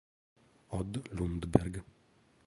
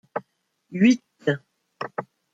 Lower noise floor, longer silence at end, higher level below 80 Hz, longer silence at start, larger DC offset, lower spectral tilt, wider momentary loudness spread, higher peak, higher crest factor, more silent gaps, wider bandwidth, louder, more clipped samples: about the same, -67 dBFS vs -67 dBFS; first, 0.65 s vs 0.3 s; first, -50 dBFS vs -72 dBFS; first, 0.7 s vs 0.15 s; neither; first, -7.5 dB/octave vs -6 dB/octave; second, 11 LU vs 17 LU; about the same, -8 dBFS vs -6 dBFS; first, 30 dB vs 20 dB; neither; first, 11.5 kHz vs 7.8 kHz; second, -35 LUFS vs -24 LUFS; neither